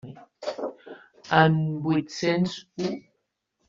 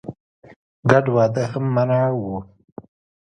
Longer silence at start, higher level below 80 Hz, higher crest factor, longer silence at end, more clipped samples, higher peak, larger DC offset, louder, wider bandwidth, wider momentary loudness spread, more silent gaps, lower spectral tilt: about the same, 0.05 s vs 0.05 s; second, -66 dBFS vs -54 dBFS; about the same, 24 dB vs 22 dB; about the same, 0.7 s vs 0.8 s; neither; second, -4 dBFS vs 0 dBFS; neither; second, -25 LUFS vs -19 LUFS; second, 7.6 kHz vs 9.2 kHz; first, 25 LU vs 16 LU; second, none vs 0.20-0.42 s, 0.56-0.83 s; second, -5 dB/octave vs -8 dB/octave